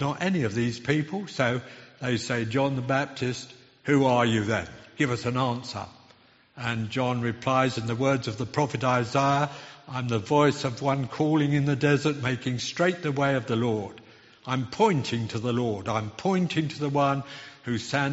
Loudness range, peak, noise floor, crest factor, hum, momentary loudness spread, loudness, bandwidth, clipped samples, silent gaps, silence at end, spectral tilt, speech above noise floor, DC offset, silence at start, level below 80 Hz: 3 LU; -8 dBFS; -58 dBFS; 18 dB; none; 10 LU; -26 LUFS; 8 kHz; under 0.1%; none; 0 s; -5 dB/octave; 32 dB; under 0.1%; 0 s; -60 dBFS